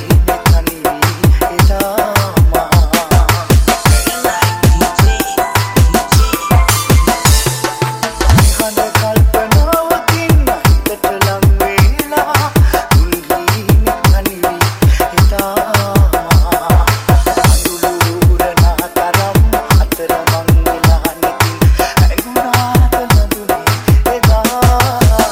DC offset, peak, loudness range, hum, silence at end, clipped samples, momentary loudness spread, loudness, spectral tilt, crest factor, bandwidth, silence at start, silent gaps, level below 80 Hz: 0.2%; 0 dBFS; 1 LU; none; 0 s; under 0.1%; 4 LU; -12 LUFS; -5 dB/octave; 10 dB; 17 kHz; 0 s; none; -16 dBFS